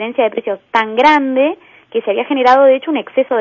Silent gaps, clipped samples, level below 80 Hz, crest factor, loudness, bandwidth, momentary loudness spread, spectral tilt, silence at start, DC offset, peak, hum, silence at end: none; under 0.1%; -56 dBFS; 14 dB; -13 LUFS; 7.2 kHz; 11 LU; -4.5 dB/octave; 0 s; under 0.1%; 0 dBFS; none; 0 s